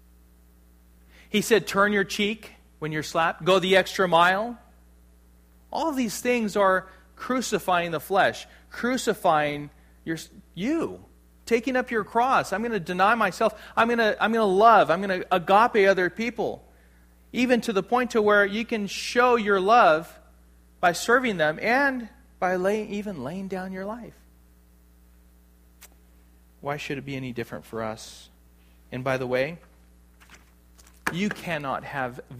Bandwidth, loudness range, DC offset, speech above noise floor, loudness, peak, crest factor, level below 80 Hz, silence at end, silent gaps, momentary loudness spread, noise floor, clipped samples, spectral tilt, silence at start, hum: 15.5 kHz; 14 LU; under 0.1%; 32 dB; -24 LUFS; -4 dBFS; 20 dB; -56 dBFS; 0 s; none; 15 LU; -55 dBFS; under 0.1%; -4.5 dB/octave; 1.3 s; none